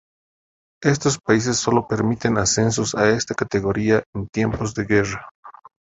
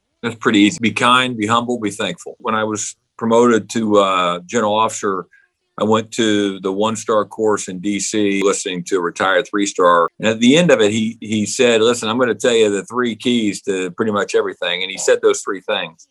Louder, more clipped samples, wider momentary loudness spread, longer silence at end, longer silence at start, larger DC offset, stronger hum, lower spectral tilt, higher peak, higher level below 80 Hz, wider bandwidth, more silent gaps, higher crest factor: second, -20 LUFS vs -17 LUFS; neither; second, 5 LU vs 9 LU; first, 0.45 s vs 0.2 s; first, 0.8 s vs 0.25 s; neither; neither; about the same, -4.5 dB/octave vs -4 dB/octave; about the same, -2 dBFS vs 0 dBFS; first, -46 dBFS vs -62 dBFS; second, 8.2 kHz vs 12.5 kHz; first, 4.06-4.13 s, 5.31-5.43 s vs none; about the same, 20 dB vs 16 dB